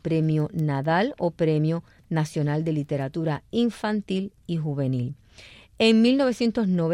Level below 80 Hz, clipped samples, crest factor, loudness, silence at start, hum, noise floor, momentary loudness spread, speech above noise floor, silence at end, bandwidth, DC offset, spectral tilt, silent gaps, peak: -58 dBFS; under 0.1%; 16 dB; -25 LUFS; 0.05 s; none; -49 dBFS; 10 LU; 26 dB; 0 s; 11.5 kHz; under 0.1%; -7 dB/octave; none; -8 dBFS